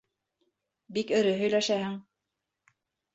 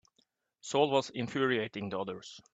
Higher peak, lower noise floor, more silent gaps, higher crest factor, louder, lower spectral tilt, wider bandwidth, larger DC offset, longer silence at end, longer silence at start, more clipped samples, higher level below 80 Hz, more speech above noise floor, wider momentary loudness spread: about the same, -14 dBFS vs -12 dBFS; first, -85 dBFS vs -75 dBFS; neither; about the same, 18 dB vs 20 dB; first, -28 LUFS vs -32 LUFS; about the same, -4.5 dB/octave vs -4.5 dB/octave; second, 8 kHz vs 9 kHz; neither; first, 1.15 s vs 0.15 s; first, 0.9 s vs 0.65 s; neither; about the same, -74 dBFS vs -76 dBFS; first, 58 dB vs 43 dB; about the same, 11 LU vs 13 LU